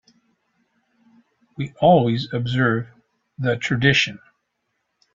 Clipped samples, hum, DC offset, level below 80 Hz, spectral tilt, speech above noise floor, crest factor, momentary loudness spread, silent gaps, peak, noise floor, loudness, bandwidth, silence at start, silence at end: under 0.1%; none; under 0.1%; -56 dBFS; -6 dB/octave; 55 dB; 20 dB; 13 LU; none; -2 dBFS; -74 dBFS; -20 LUFS; 7.6 kHz; 1.6 s; 0.95 s